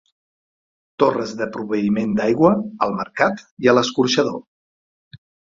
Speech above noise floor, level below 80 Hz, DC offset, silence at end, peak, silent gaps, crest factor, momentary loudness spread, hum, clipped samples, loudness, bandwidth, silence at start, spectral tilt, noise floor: over 71 dB; -58 dBFS; under 0.1%; 0.4 s; 0 dBFS; 3.51-3.57 s, 4.47-5.11 s; 20 dB; 8 LU; none; under 0.1%; -19 LUFS; 7.6 kHz; 1 s; -5 dB/octave; under -90 dBFS